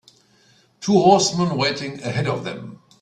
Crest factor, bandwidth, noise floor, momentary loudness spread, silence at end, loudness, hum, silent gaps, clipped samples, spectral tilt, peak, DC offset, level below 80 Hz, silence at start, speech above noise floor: 20 dB; 11 kHz; -57 dBFS; 17 LU; 0.25 s; -19 LUFS; none; none; under 0.1%; -4.5 dB/octave; 0 dBFS; under 0.1%; -58 dBFS; 0.8 s; 38 dB